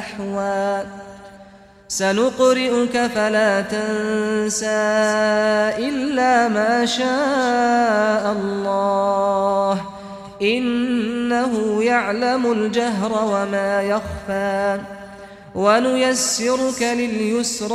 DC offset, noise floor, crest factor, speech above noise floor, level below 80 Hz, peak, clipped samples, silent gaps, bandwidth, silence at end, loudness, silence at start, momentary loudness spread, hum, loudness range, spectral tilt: under 0.1%; -45 dBFS; 16 dB; 26 dB; -52 dBFS; -4 dBFS; under 0.1%; none; 14.5 kHz; 0 s; -19 LUFS; 0 s; 8 LU; none; 3 LU; -3.5 dB/octave